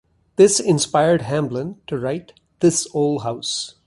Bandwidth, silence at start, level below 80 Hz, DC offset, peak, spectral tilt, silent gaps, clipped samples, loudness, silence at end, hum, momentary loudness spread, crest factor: 11.5 kHz; 0.4 s; -56 dBFS; under 0.1%; -2 dBFS; -4.5 dB/octave; none; under 0.1%; -19 LUFS; 0.15 s; none; 13 LU; 18 dB